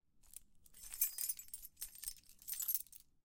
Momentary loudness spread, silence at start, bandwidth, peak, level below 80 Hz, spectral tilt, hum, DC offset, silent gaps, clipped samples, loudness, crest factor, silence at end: 20 LU; 0.15 s; 17 kHz; -18 dBFS; -70 dBFS; 2 dB/octave; none; under 0.1%; none; under 0.1%; -41 LUFS; 28 dB; 0.2 s